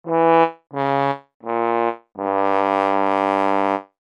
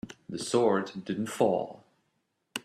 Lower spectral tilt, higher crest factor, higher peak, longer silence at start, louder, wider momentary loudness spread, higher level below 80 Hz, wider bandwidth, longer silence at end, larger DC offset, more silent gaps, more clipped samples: first, -7 dB/octave vs -5 dB/octave; about the same, 18 dB vs 20 dB; first, -2 dBFS vs -10 dBFS; about the same, 0.05 s vs 0.05 s; first, -20 LUFS vs -29 LUFS; second, 9 LU vs 15 LU; second, -80 dBFS vs -70 dBFS; second, 9.4 kHz vs 14.5 kHz; first, 0.2 s vs 0.05 s; neither; first, 1.34-1.40 s vs none; neither